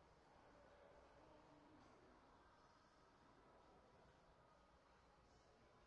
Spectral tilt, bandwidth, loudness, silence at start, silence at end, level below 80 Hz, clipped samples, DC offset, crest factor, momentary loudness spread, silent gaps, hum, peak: -4 dB/octave; 7.4 kHz; -69 LUFS; 0 s; 0 s; -82 dBFS; under 0.1%; under 0.1%; 14 dB; 1 LU; none; none; -58 dBFS